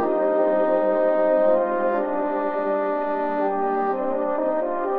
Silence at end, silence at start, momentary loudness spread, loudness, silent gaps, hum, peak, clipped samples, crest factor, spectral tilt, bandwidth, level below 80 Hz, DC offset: 0 s; 0 s; 5 LU; -22 LUFS; none; none; -10 dBFS; under 0.1%; 12 dB; -9.5 dB/octave; 4.6 kHz; -64 dBFS; under 0.1%